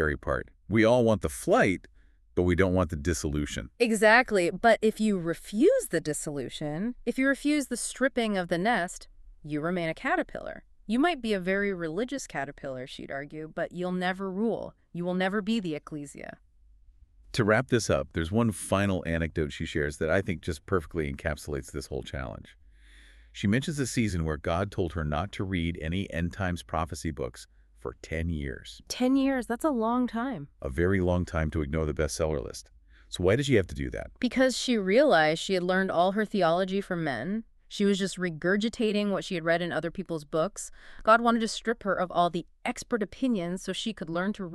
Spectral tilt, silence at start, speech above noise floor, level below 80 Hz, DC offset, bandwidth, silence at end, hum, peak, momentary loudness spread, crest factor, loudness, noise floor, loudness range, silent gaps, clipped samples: -5.5 dB/octave; 0 s; 29 dB; -46 dBFS; under 0.1%; 13.5 kHz; 0 s; none; -6 dBFS; 13 LU; 22 dB; -28 LUFS; -57 dBFS; 7 LU; none; under 0.1%